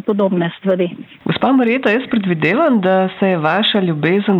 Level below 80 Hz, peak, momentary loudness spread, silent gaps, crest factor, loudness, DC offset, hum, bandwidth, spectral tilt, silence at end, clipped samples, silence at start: -60 dBFS; -4 dBFS; 5 LU; none; 12 dB; -15 LUFS; under 0.1%; none; 5.8 kHz; -8.5 dB/octave; 0 s; under 0.1%; 0.05 s